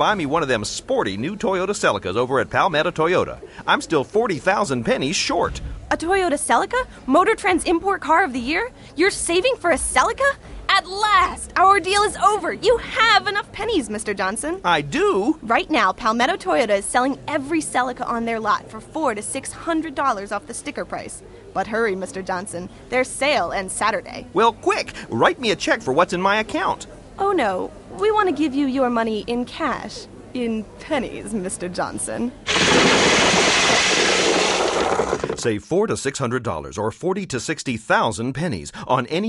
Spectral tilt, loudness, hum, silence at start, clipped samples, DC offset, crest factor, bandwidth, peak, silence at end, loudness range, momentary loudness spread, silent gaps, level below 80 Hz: -3 dB/octave; -20 LUFS; none; 0 s; under 0.1%; under 0.1%; 18 dB; 11.5 kHz; -2 dBFS; 0 s; 7 LU; 12 LU; none; -44 dBFS